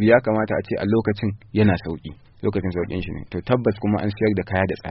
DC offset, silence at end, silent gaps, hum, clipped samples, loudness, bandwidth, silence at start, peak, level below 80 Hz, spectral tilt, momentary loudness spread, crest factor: under 0.1%; 0 s; none; none; under 0.1%; -22 LUFS; 5.8 kHz; 0 s; -2 dBFS; -46 dBFS; -6.5 dB/octave; 10 LU; 18 dB